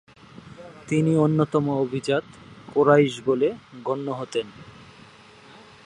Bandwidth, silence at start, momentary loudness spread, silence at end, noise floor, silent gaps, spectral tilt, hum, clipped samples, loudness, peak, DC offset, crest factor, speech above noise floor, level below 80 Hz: 11 kHz; 0.45 s; 16 LU; 1.15 s; -49 dBFS; none; -7 dB/octave; none; under 0.1%; -23 LUFS; -4 dBFS; under 0.1%; 20 dB; 27 dB; -62 dBFS